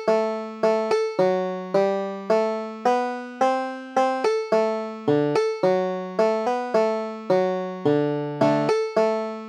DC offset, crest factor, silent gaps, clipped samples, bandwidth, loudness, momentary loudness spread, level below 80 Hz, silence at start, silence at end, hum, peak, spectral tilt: under 0.1%; 16 dB; none; under 0.1%; 9.6 kHz; -23 LUFS; 5 LU; -76 dBFS; 0 s; 0 s; none; -6 dBFS; -6.5 dB/octave